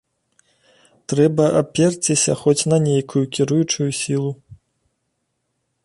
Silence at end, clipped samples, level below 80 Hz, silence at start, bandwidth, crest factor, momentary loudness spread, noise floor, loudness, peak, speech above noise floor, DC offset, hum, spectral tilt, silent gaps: 1.3 s; under 0.1%; -58 dBFS; 1.1 s; 11.5 kHz; 18 dB; 8 LU; -73 dBFS; -18 LUFS; -2 dBFS; 55 dB; under 0.1%; none; -5 dB/octave; none